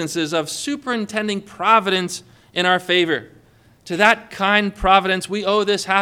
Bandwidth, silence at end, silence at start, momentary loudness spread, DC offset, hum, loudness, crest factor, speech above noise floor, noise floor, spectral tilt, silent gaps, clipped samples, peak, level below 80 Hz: 17.5 kHz; 0 s; 0 s; 10 LU; under 0.1%; none; -18 LUFS; 20 dB; 33 dB; -52 dBFS; -3.5 dB/octave; none; under 0.1%; 0 dBFS; -44 dBFS